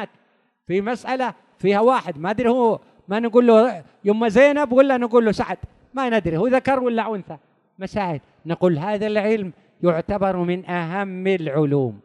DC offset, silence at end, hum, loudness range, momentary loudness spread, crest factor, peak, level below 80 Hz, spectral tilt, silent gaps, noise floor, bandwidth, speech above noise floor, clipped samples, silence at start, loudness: under 0.1%; 0.05 s; none; 6 LU; 12 LU; 18 dB; -2 dBFS; -52 dBFS; -7.5 dB/octave; none; -63 dBFS; 10.5 kHz; 44 dB; under 0.1%; 0 s; -20 LUFS